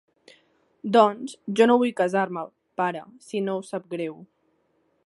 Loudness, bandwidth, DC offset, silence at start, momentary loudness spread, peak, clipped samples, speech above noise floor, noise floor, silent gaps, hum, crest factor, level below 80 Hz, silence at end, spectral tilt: -24 LUFS; 11.5 kHz; under 0.1%; 0.85 s; 16 LU; -2 dBFS; under 0.1%; 45 dB; -69 dBFS; none; none; 22 dB; -76 dBFS; 0.85 s; -5.5 dB/octave